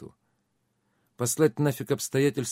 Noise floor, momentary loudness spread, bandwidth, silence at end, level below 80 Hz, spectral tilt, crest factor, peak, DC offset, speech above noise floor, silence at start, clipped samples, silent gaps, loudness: -74 dBFS; 6 LU; 16 kHz; 0 s; -68 dBFS; -5 dB/octave; 20 dB; -8 dBFS; under 0.1%; 49 dB; 0 s; under 0.1%; none; -26 LUFS